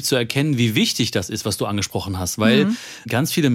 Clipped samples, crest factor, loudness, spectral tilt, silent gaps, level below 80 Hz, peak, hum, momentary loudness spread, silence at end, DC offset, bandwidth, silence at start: under 0.1%; 16 dB; -20 LUFS; -4.5 dB/octave; none; -56 dBFS; -2 dBFS; none; 8 LU; 0 s; under 0.1%; 17 kHz; 0 s